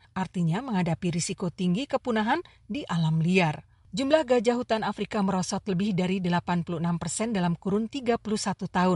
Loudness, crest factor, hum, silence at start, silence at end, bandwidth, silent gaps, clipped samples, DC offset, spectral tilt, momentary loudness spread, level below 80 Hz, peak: -27 LUFS; 18 dB; none; 0.15 s; 0 s; 11.5 kHz; none; under 0.1%; under 0.1%; -5.5 dB/octave; 6 LU; -58 dBFS; -8 dBFS